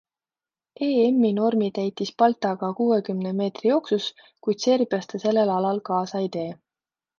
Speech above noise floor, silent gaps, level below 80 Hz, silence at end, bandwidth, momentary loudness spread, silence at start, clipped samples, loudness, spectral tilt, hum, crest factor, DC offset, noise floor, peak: over 67 dB; none; -74 dBFS; 0.65 s; 7.2 kHz; 8 LU; 0.8 s; under 0.1%; -24 LUFS; -6 dB/octave; none; 18 dB; under 0.1%; under -90 dBFS; -6 dBFS